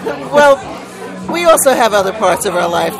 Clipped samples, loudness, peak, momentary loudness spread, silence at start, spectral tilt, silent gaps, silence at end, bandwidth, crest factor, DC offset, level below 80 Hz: 0.3%; -11 LUFS; 0 dBFS; 17 LU; 0 s; -3 dB/octave; none; 0 s; 16.5 kHz; 12 dB; under 0.1%; -46 dBFS